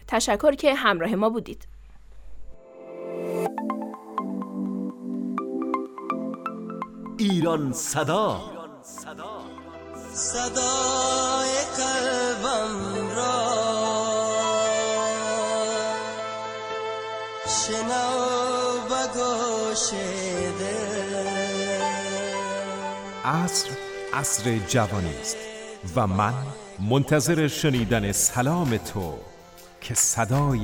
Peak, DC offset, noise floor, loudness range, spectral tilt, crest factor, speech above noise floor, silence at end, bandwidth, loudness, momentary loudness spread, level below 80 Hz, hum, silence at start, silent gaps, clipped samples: -6 dBFS; under 0.1%; -47 dBFS; 6 LU; -3.5 dB/octave; 20 dB; 23 dB; 0 s; 18 kHz; -25 LUFS; 13 LU; -50 dBFS; none; 0 s; none; under 0.1%